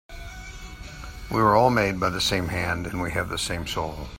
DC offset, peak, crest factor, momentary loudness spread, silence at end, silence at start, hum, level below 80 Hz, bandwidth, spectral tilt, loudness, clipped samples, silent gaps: under 0.1%; -4 dBFS; 20 dB; 21 LU; 0 s; 0.1 s; none; -42 dBFS; 16.5 kHz; -4.5 dB/octave; -24 LUFS; under 0.1%; none